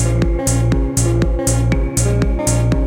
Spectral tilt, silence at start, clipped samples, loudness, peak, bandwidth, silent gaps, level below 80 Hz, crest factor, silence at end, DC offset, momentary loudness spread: -5.5 dB/octave; 0 s; under 0.1%; -16 LUFS; -4 dBFS; 16.5 kHz; none; -20 dBFS; 12 dB; 0 s; under 0.1%; 1 LU